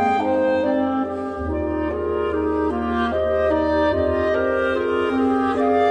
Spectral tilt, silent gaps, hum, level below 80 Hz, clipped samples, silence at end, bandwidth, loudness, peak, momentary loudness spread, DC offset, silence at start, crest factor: -7.5 dB/octave; none; none; -38 dBFS; under 0.1%; 0 s; 9.6 kHz; -21 LUFS; -8 dBFS; 5 LU; under 0.1%; 0 s; 12 dB